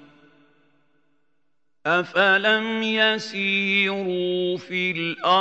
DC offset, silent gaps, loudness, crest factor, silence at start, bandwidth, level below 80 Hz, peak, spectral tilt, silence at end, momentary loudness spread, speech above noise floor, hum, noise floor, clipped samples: under 0.1%; none; -21 LUFS; 18 dB; 1.85 s; 8.2 kHz; -78 dBFS; -4 dBFS; -4.5 dB/octave; 0 s; 7 LU; 56 dB; none; -77 dBFS; under 0.1%